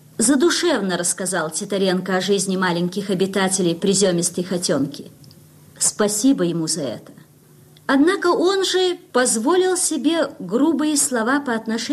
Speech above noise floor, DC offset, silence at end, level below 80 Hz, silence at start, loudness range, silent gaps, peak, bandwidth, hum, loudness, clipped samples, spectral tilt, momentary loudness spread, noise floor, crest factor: 30 dB; under 0.1%; 0 s; -64 dBFS; 0.2 s; 3 LU; none; -6 dBFS; 14.5 kHz; none; -19 LUFS; under 0.1%; -3.5 dB/octave; 6 LU; -49 dBFS; 14 dB